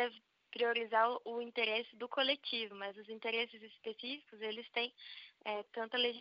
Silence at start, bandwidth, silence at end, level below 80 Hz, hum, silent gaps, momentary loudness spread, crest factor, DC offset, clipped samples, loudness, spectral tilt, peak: 0 s; 5.6 kHz; 0 s; under -90 dBFS; none; none; 13 LU; 20 dB; under 0.1%; under 0.1%; -38 LUFS; 1.5 dB/octave; -18 dBFS